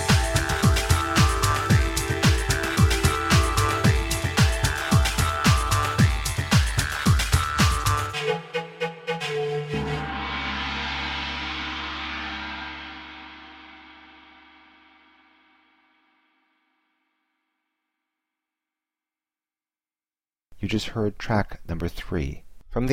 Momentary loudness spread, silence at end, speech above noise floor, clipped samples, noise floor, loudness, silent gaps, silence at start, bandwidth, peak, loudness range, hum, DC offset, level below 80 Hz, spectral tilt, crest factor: 12 LU; 0 s; over 63 dB; under 0.1%; under -90 dBFS; -24 LUFS; none; 0 s; 16.5 kHz; -6 dBFS; 14 LU; none; under 0.1%; -32 dBFS; -4.5 dB/octave; 20 dB